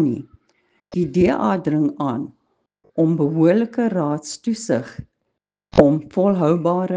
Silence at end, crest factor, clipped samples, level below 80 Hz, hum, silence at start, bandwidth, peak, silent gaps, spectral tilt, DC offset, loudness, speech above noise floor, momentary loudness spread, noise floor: 0 s; 20 dB; under 0.1%; -50 dBFS; none; 0 s; 9.6 kHz; 0 dBFS; none; -7.5 dB/octave; under 0.1%; -19 LUFS; 58 dB; 13 LU; -77 dBFS